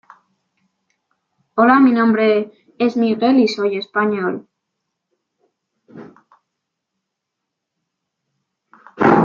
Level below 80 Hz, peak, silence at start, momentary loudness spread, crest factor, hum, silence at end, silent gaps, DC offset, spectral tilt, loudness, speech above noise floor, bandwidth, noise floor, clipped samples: -66 dBFS; -2 dBFS; 1.55 s; 12 LU; 18 dB; none; 0 s; none; under 0.1%; -7 dB/octave; -16 LUFS; 64 dB; 7.2 kHz; -79 dBFS; under 0.1%